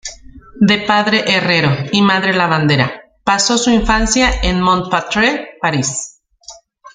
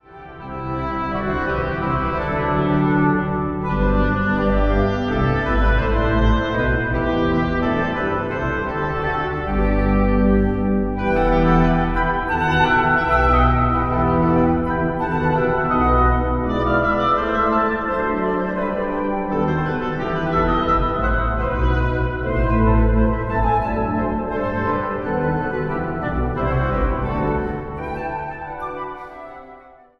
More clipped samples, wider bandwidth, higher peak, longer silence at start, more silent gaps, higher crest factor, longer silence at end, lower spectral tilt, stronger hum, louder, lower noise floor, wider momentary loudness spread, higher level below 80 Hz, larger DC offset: neither; first, 9.6 kHz vs 6.4 kHz; first, 0 dBFS vs -4 dBFS; about the same, 0.05 s vs 0.1 s; neither; about the same, 14 dB vs 16 dB; second, 0.05 s vs 0.4 s; second, -4 dB/octave vs -8.5 dB/octave; neither; first, -14 LUFS vs -20 LUFS; second, -40 dBFS vs -44 dBFS; about the same, 7 LU vs 7 LU; about the same, -30 dBFS vs -26 dBFS; neither